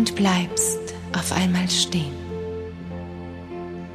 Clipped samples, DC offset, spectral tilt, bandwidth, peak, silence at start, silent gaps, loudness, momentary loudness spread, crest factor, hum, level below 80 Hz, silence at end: under 0.1%; under 0.1%; -3.5 dB/octave; 14 kHz; -6 dBFS; 0 s; none; -23 LUFS; 14 LU; 18 dB; none; -48 dBFS; 0 s